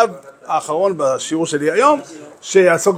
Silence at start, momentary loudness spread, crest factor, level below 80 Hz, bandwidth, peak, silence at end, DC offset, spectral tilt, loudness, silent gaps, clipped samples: 0 s; 14 LU; 16 dB; -68 dBFS; 15.5 kHz; 0 dBFS; 0 s; under 0.1%; -4 dB/octave; -16 LUFS; none; under 0.1%